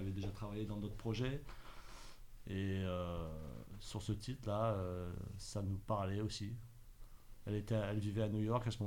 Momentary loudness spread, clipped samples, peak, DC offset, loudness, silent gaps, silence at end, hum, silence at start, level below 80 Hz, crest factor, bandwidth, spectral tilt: 17 LU; under 0.1%; -24 dBFS; under 0.1%; -42 LUFS; none; 0 s; none; 0 s; -54 dBFS; 18 dB; 17.5 kHz; -6.5 dB/octave